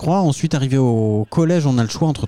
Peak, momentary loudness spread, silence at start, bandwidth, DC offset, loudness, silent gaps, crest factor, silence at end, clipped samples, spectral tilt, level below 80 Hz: -6 dBFS; 3 LU; 0 s; 12 kHz; under 0.1%; -17 LUFS; none; 10 dB; 0 s; under 0.1%; -7 dB/octave; -48 dBFS